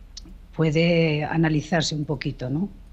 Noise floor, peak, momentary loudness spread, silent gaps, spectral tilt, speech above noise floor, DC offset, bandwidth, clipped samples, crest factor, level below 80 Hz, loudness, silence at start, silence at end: -42 dBFS; -8 dBFS; 14 LU; none; -6 dB/octave; 19 dB; under 0.1%; 8.4 kHz; under 0.1%; 14 dB; -44 dBFS; -23 LUFS; 0 s; 0.05 s